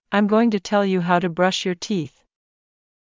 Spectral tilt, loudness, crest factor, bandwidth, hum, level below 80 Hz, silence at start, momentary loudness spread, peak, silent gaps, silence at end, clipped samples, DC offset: -5.5 dB/octave; -20 LUFS; 16 dB; 7.6 kHz; none; -64 dBFS; 0.1 s; 8 LU; -6 dBFS; none; 1.05 s; under 0.1%; under 0.1%